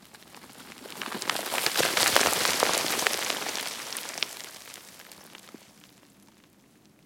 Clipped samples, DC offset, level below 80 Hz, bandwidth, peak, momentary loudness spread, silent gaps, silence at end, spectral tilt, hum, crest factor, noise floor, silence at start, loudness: under 0.1%; under 0.1%; -68 dBFS; 17 kHz; -2 dBFS; 25 LU; none; 1.4 s; -0.5 dB/octave; none; 30 dB; -59 dBFS; 0.15 s; -26 LUFS